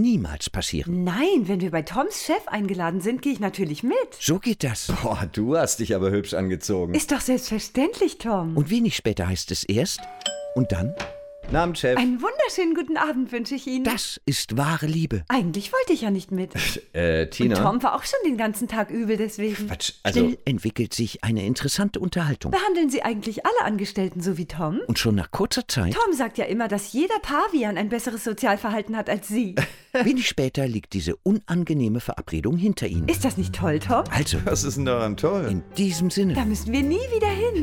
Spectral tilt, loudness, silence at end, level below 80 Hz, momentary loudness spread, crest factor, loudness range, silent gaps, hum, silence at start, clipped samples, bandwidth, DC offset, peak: -5 dB/octave; -24 LUFS; 0 s; -42 dBFS; 5 LU; 18 dB; 1 LU; none; none; 0 s; under 0.1%; 18.5 kHz; under 0.1%; -6 dBFS